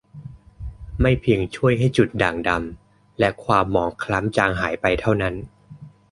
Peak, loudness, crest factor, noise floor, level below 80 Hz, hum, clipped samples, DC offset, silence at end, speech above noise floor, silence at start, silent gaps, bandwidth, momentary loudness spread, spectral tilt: -2 dBFS; -21 LUFS; 20 dB; -44 dBFS; -36 dBFS; none; under 0.1%; under 0.1%; 0.25 s; 23 dB; 0.15 s; none; 11.5 kHz; 19 LU; -7 dB/octave